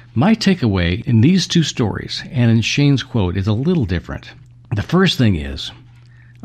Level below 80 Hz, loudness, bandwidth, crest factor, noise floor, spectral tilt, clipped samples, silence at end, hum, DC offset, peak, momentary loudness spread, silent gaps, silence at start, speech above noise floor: -40 dBFS; -16 LUFS; 12 kHz; 14 dB; -43 dBFS; -6 dB/octave; under 0.1%; 0.7 s; none; under 0.1%; -2 dBFS; 12 LU; none; 0.15 s; 27 dB